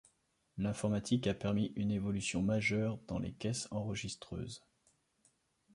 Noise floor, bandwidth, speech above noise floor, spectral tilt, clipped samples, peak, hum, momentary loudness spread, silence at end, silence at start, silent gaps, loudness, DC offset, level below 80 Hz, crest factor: -76 dBFS; 11.5 kHz; 40 dB; -5.5 dB/octave; under 0.1%; -20 dBFS; none; 11 LU; 1.15 s; 0.55 s; none; -37 LUFS; under 0.1%; -60 dBFS; 18 dB